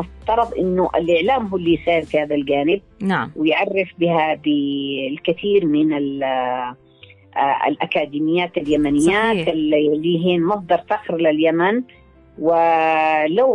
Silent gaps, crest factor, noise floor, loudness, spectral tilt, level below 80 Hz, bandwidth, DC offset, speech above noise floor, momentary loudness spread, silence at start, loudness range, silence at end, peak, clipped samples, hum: none; 12 dB; -47 dBFS; -18 LUFS; -6 dB/octave; -48 dBFS; 11.5 kHz; under 0.1%; 29 dB; 6 LU; 0 s; 3 LU; 0 s; -6 dBFS; under 0.1%; none